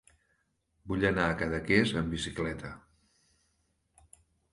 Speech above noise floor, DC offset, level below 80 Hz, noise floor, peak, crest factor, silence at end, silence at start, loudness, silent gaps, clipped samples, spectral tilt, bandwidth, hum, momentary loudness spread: 45 dB; under 0.1%; -50 dBFS; -76 dBFS; -10 dBFS; 24 dB; 1.75 s; 0.85 s; -30 LUFS; none; under 0.1%; -5.5 dB/octave; 11.5 kHz; none; 15 LU